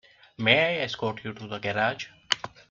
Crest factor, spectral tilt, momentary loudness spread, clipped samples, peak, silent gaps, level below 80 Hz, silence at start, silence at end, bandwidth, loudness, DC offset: 26 dB; -4 dB/octave; 14 LU; under 0.1%; -2 dBFS; none; -64 dBFS; 0.4 s; 0.25 s; 7.6 kHz; -26 LUFS; under 0.1%